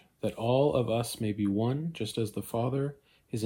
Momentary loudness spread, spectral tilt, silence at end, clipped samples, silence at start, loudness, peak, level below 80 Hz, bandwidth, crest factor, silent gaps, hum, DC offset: 8 LU; -6.5 dB/octave; 0 s; under 0.1%; 0.25 s; -31 LUFS; -14 dBFS; -60 dBFS; 17 kHz; 16 dB; none; none; under 0.1%